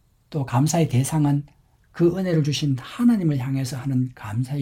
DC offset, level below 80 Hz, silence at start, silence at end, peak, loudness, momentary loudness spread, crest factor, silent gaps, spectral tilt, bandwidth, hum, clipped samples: under 0.1%; -54 dBFS; 0.3 s; 0 s; -8 dBFS; -23 LUFS; 7 LU; 14 dB; none; -6.5 dB/octave; 16.5 kHz; none; under 0.1%